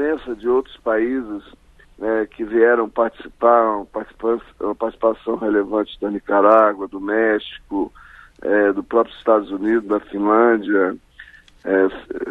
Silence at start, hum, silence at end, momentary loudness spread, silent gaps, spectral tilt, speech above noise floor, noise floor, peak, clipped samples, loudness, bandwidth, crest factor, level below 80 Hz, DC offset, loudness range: 0 s; none; 0 s; 12 LU; none; -7.5 dB/octave; 26 dB; -45 dBFS; 0 dBFS; under 0.1%; -19 LUFS; 4.4 kHz; 18 dB; -52 dBFS; under 0.1%; 2 LU